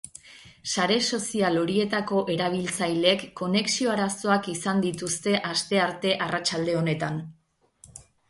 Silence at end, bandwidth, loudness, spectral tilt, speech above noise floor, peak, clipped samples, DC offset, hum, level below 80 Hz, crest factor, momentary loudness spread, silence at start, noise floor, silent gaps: 0.3 s; 11.5 kHz; -25 LUFS; -4 dB/octave; 32 dB; -8 dBFS; under 0.1%; under 0.1%; none; -64 dBFS; 20 dB; 6 LU; 0.05 s; -58 dBFS; none